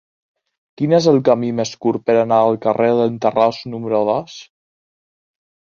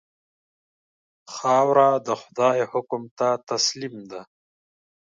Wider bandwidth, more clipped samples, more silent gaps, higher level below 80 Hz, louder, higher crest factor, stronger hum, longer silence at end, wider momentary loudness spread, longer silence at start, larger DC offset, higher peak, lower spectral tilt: second, 7.2 kHz vs 9.2 kHz; neither; second, none vs 3.11-3.17 s; first, -60 dBFS vs -78 dBFS; first, -17 LUFS vs -22 LUFS; about the same, 16 dB vs 20 dB; neither; first, 1.25 s vs 0.9 s; second, 10 LU vs 20 LU; second, 0.8 s vs 1.3 s; neither; first, -2 dBFS vs -6 dBFS; first, -6.5 dB/octave vs -3.5 dB/octave